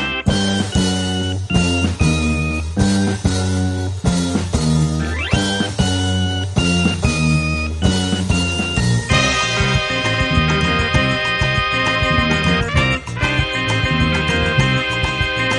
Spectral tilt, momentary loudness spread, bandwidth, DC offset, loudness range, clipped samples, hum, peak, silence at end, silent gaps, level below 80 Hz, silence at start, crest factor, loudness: -4.5 dB/octave; 4 LU; 11.5 kHz; under 0.1%; 2 LU; under 0.1%; none; 0 dBFS; 0 s; none; -28 dBFS; 0 s; 16 dB; -17 LUFS